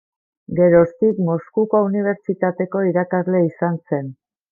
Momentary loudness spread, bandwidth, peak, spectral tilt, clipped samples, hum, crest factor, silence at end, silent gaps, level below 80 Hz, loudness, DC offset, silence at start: 10 LU; 2.4 kHz; -2 dBFS; -13 dB/octave; under 0.1%; none; 16 dB; 0.4 s; none; -56 dBFS; -19 LUFS; under 0.1%; 0.5 s